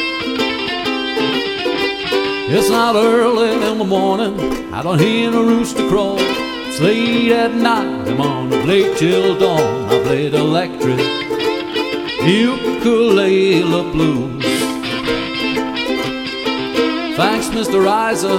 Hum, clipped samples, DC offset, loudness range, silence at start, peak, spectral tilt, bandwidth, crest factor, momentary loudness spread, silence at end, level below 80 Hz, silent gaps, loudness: none; under 0.1%; 0.1%; 2 LU; 0 s; 0 dBFS; -5 dB/octave; 17 kHz; 16 dB; 6 LU; 0 s; -44 dBFS; none; -16 LUFS